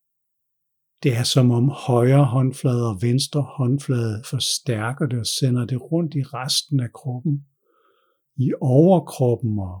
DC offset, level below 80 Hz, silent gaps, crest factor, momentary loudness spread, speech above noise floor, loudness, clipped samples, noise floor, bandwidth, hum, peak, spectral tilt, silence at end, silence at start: under 0.1%; -64 dBFS; none; 16 dB; 9 LU; 56 dB; -21 LUFS; under 0.1%; -76 dBFS; 18 kHz; none; -4 dBFS; -6 dB/octave; 0 s; 1 s